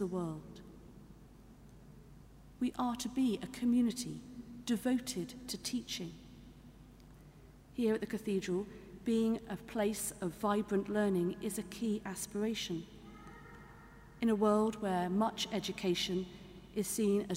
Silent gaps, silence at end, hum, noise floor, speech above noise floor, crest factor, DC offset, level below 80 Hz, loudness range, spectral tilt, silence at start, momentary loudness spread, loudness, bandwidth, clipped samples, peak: none; 0 s; none; -57 dBFS; 22 dB; 18 dB; under 0.1%; -62 dBFS; 6 LU; -5 dB/octave; 0 s; 21 LU; -36 LUFS; 16 kHz; under 0.1%; -18 dBFS